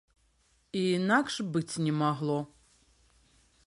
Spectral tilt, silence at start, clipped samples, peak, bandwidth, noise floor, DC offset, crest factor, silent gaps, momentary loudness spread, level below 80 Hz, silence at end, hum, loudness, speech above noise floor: -5.5 dB/octave; 0.75 s; under 0.1%; -12 dBFS; 11.5 kHz; -69 dBFS; under 0.1%; 20 dB; none; 9 LU; -68 dBFS; 1.2 s; none; -30 LUFS; 40 dB